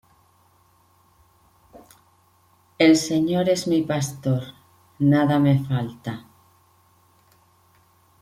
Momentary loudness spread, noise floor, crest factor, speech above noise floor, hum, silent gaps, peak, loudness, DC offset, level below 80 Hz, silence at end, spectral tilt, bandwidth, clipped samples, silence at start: 16 LU; -60 dBFS; 18 dB; 40 dB; none; none; -6 dBFS; -21 LUFS; under 0.1%; -62 dBFS; 2 s; -6 dB/octave; 15.5 kHz; under 0.1%; 2.8 s